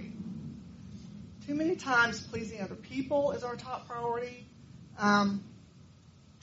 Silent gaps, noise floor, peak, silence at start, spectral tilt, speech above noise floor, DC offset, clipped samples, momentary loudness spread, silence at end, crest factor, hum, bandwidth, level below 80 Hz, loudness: none; -57 dBFS; -14 dBFS; 0 s; -4 dB/octave; 26 dB; under 0.1%; under 0.1%; 21 LU; 0.35 s; 20 dB; none; 7.6 kHz; -64 dBFS; -32 LUFS